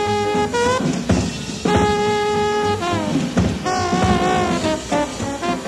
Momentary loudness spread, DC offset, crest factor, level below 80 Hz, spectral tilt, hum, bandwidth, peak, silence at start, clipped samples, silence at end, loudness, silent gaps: 5 LU; under 0.1%; 16 dB; -36 dBFS; -5 dB/octave; none; 13.5 kHz; -2 dBFS; 0 s; under 0.1%; 0 s; -19 LUFS; none